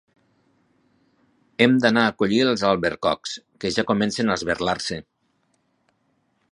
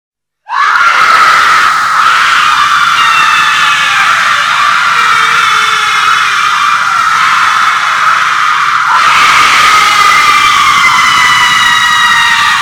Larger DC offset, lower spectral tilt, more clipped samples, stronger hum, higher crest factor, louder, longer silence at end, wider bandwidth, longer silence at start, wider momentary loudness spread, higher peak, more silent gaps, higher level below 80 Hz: neither; first, -4.5 dB/octave vs 0.5 dB/octave; second, under 0.1% vs 3%; neither; first, 22 dB vs 8 dB; second, -21 LUFS vs -5 LUFS; first, 1.5 s vs 0 s; second, 11.5 kHz vs over 20 kHz; first, 1.6 s vs 0.5 s; first, 12 LU vs 4 LU; about the same, -2 dBFS vs 0 dBFS; neither; second, -54 dBFS vs -46 dBFS